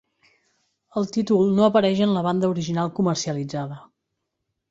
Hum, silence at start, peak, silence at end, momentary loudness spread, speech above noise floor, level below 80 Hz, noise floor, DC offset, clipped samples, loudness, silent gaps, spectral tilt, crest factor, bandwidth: none; 0.95 s; -4 dBFS; 0.9 s; 13 LU; 58 dB; -62 dBFS; -79 dBFS; under 0.1%; under 0.1%; -22 LUFS; none; -6.5 dB/octave; 20 dB; 7.8 kHz